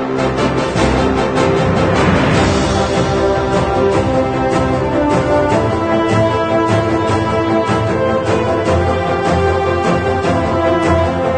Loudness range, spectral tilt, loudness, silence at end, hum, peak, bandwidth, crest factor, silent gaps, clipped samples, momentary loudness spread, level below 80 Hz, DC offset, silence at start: 1 LU; -6.5 dB/octave; -14 LUFS; 0 s; none; 0 dBFS; 9.4 kHz; 14 dB; none; under 0.1%; 2 LU; -30 dBFS; under 0.1%; 0 s